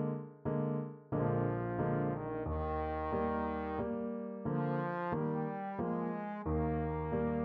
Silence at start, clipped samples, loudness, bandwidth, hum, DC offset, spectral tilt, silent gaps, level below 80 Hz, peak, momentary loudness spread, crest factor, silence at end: 0 s; under 0.1%; -37 LUFS; 4.6 kHz; none; under 0.1%; -9 dB/octave; none; -50 dBFS; -22 dBFS; 5 LU; 14 dB; 0 s